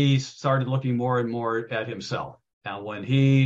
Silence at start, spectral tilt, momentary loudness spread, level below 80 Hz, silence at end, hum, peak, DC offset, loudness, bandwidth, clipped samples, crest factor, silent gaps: 0 s; -7 dB/octave; 12 LU; -64 dBFS; 0 s; none; -8 dBFS; under 0.1%; -26 LUFS; 7.6 kHz; under 0.1%; 16 dB; 2.53-2.61 s